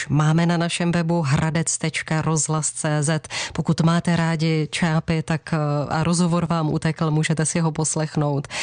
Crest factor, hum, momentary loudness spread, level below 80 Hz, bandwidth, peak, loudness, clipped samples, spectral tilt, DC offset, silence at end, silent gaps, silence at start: 12 dB; none; 4 LU; -50 dBFS; 10 kHz; -10 dBFS; -21 LUFS; under 0.1%; -5 dB/octave; under 0.1%; 0 s; none; 0 s